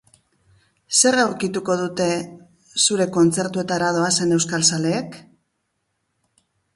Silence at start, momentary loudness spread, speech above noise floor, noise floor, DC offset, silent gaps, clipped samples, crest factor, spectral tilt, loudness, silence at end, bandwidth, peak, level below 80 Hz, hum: 0.9 s; 10 LU; 54 dB; -73 dBFS; under 0.1%; none; under 0.1%; 18 dB; -3 dB/octave; -19 LUFS; 1.55 s; 11.5 kHz; -4 dBFS; -62 dBFS; none